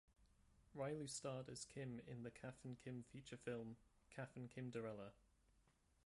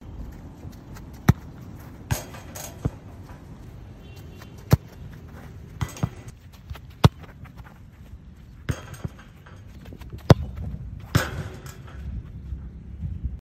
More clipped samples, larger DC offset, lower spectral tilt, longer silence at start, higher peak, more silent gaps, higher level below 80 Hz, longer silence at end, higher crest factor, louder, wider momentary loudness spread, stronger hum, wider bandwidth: neither; neither; second, -5 dB/octave vs -6.5 dB/octave; about the same, 0.1 s vs 0 s; second, -36 dBFS vs 0 dBFS; neither; second, -78 dBFS vs -38 dBFS; first, 0.45 s vs 0 s; second, 18 dB vs 28 dB; second, -53 LUFS vs -27 LUFS; second, 9 LU vs 23 LU; neither; second, 11.5 kHz vs 16 kHz